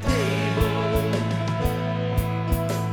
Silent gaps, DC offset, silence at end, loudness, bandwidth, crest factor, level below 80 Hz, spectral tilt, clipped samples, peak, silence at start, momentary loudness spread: none; under 0.1%; 0 s; -24 LUFS; 19 kHz; 16 dB; -32 dBFS; -6.5 dB/octave; under 0.1%; -8 dBFS; 0 s; 2 LU